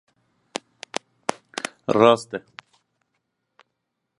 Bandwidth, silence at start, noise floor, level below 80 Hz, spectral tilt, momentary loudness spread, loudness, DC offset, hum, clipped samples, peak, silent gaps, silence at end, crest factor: 11.5 kHz; 1.3 s; -79 dBFS; -70 dBFS; -4.5 dB/octave; 19 LU; -23 LUFS; under 0.1%; none; under 0.1%; -2 dBFS; none; 1.8 s; 26 dB